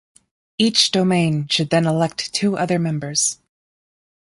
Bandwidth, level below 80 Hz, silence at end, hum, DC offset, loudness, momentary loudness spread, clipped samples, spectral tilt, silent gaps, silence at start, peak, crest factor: 11.5 kHz; -58 dBFS; 0.85 s; none; under 0.1%; -18 LUFS; 6 LU; under 0.1%; -4 dB/octave; none; 0.6 s; -2 dBFS; 18 dB